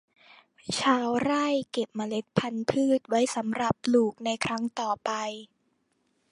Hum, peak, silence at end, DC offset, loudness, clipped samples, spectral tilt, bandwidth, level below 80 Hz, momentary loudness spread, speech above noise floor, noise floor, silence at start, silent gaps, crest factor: none; -6 dBFS; 0.85 s; under 0.1%; -28 LUFS; under 0.1%; -4.5 dB/octave; 11.5 kHz; -64 dBFS; 8 LU; 46 dB; -73 dBFS; 0.65 s; none; 22 dB